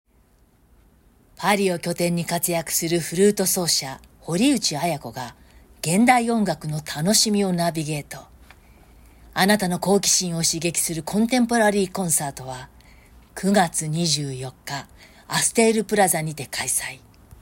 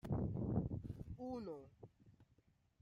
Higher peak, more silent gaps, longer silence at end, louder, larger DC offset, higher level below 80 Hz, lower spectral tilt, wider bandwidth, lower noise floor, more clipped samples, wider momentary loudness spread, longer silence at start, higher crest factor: first, -4 dBFS vs -26 dBFS; neither; about the same, 0.45 s vs 0.55 s; first, -21 LUFS vs -45 LUFS; neither; first, -52 dBFS vs -58 dBFS; second, -3.5 dB/octave vs -10.5 dB/octave; first, 16.5 kHz vs 7.2 kHz; second, -58 dBFS vs -76 dBFS; neither; second, 15 LU vs 21 LU; first, 1.4 s vs 0.05 s; about the same, 20 dB vs 20 dB